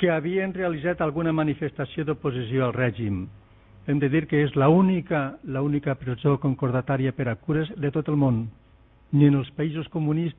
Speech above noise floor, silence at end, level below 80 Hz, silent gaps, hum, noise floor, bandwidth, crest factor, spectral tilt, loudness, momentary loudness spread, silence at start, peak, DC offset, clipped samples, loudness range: 31 dB; 0.05 s; -52 dBFS; none; none; -55 dBFS; 3.9 kHz; 18 dB; -12 dB/octave; -25 LUFS; 9 LU; 0 s; -6 dBFS; under 0.1%; under 0.1%; 3 LU